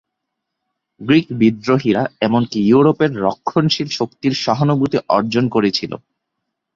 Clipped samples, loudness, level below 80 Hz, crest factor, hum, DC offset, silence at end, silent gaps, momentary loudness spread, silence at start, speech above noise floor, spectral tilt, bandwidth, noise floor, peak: under 0.1%; -16 LUFS; -54 dBFS; 16 dB; none; under 0.1%; 0.8 s; none; 7 LU; 1 s; 62 dB; -6.5 dB/octave; 7.6 kHz; -78 dBFS; -2 dBFS